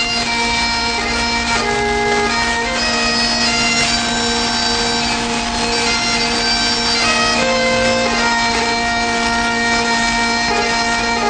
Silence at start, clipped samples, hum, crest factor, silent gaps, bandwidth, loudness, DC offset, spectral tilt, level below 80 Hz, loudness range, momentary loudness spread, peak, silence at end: 0 s; under 0.1%; none; 14 dB; none; 9.6 kHz; -14 LUFS; under 0.1%; -2 dB/octave; -34 dBFS; 1 LU; 3 LU; -2 dBFS; 0 s